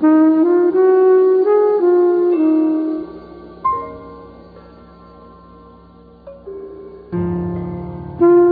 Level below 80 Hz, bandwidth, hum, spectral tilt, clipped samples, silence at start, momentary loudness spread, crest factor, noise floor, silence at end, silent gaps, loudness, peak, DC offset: -46 dBFS; 4.5 kHz; none; -12.5 dB/octave; under 0.1%; 0 s; 23 LU; 12 dB; -43 dBFS; 0 s; none; -15 LUFS; -2 dBFS; under 0.1%